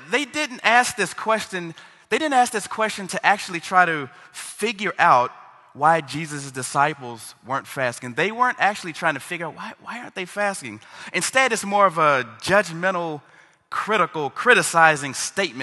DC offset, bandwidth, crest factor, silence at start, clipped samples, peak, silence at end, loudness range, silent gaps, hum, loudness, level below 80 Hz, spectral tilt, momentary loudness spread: under 0.1%; 13 kHz; 22 dB; 0 s; under 0.1%; 0 dBFS; 0 s; 4 LU; none; none; -21 LUFS; -66 dBFS; -3 dB/octave; 16 LU